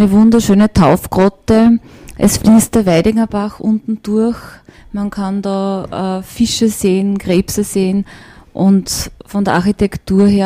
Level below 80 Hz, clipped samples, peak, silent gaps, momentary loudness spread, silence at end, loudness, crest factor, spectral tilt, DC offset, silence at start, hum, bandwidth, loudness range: -34 dBFS; under 0.1%; -2 dBFS; none; 10 LU; 0 s; -13 LUFS; 12 dB; -6 dB/octave; under 0.1%; 0 s; none; 16 kHz; 6 LU